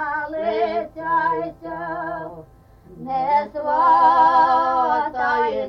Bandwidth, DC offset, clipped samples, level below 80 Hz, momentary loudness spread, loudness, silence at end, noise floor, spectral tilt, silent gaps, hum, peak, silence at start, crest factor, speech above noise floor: 6.2 kHz; under 0.1%; under 0.1%; -54 dBFS; 15 LU; -19 LUFS; 0 s; -47 dBFS; -6 dB/octave; none; none; -6 dBFS; 0 s; 14 dB; 29 dB